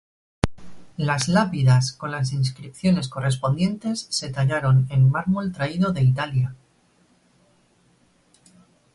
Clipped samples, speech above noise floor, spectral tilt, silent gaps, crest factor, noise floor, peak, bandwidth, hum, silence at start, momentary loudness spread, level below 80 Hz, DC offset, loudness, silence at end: under 0.1%; 40 dB; -6 dB/octave; none; 22 dB; -61 dBFS; 0 dBFS; 11.5 kHz; none; 0.45 s; 9 LU; -48 dBFS; under 0.1%; -22 LUFS; 2.4 s